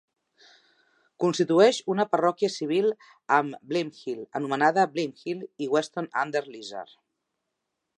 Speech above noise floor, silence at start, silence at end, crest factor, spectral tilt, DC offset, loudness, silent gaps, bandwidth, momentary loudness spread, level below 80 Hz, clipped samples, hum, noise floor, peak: 56 dB; 1.2 s; 1.15 s; 22 dB; -5 dB/octave; under 0.1%; -26 LUFS; none; 11 kHz; 14 LU; -82 dBFS; under 0.1%; none; -82 dBFS; -6 dBFS